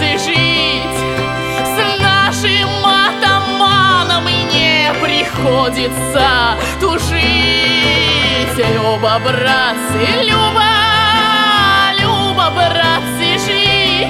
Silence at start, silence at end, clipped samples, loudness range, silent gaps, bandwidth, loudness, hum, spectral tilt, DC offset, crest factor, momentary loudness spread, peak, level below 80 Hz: 0 s; 0 s; under 0.1%; 2 LU; none; 17 kHz; -11 LUFS; none; -3.5 dB/octave; under 0.1%; 12 dB; 5 LU; 0 dBFS; -32 dBFS